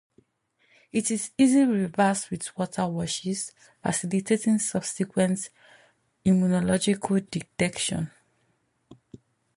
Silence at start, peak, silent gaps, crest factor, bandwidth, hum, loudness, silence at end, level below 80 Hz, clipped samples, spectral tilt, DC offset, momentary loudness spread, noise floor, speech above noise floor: 0.95 s; -10 dBFS; none; 18 dB; 11.5 kHz; none; -26 LUFS; 0.6 s; -60 dBFS; under 0.1%; -5 dB/octave; under 0.1%; 11 LU; -71 dBFS; 46 dB